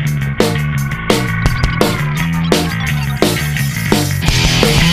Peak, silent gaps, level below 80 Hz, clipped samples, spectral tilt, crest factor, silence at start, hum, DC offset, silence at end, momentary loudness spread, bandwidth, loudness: 0 dBFS; none; -24 dBFS; under 0.1%; -4.5 dB/octave; 14 dB; 0 s; none; under 0.1%; 0 s; 6 LU; 15.5 kHz; -14 LUFS